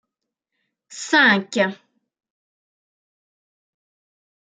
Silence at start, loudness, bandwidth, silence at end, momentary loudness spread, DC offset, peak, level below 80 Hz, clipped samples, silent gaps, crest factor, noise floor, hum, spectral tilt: 0.9 s; -17 LUFS; 9.6 kHz; 2.7 s; 10 LU; under 0.1%; -4 dBFS; -78 dBFS; under 0.1%; none; 22 dB; -82 dBFS; none; -3.5 dB/octave